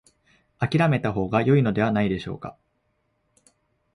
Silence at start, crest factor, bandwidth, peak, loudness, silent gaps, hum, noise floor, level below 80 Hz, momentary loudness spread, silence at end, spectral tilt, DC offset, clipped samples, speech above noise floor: 0.6 s; 16 dB; 11 kHz; -8 dBFS; -23 LUFS; none; none; -71 dBFS; -52 dBFS; 14 LU; 1.45 s; -8.5 dB/octave; under 0.1%; under 0.1%; 49 dB